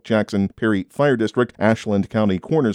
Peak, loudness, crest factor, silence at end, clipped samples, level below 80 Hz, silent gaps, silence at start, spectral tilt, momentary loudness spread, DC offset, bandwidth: -4 dBFS; -20 LUFS; 14 dB; 0 s; under 0.1%; -56 dBFS; none; 0.05 s; -7 dB/octave; 3 LU; under 0.1%; 11 kHz